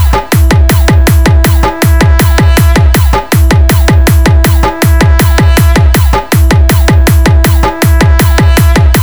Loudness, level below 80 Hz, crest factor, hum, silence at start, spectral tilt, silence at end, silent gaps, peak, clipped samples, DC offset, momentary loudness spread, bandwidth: -7 LUFS; -8 dBFS; 4 dB; none; 0 s; -5.5 dB/octave; 0 s; none; 0 dBFS; 4%; 2%; 2 LU; over 20 kHz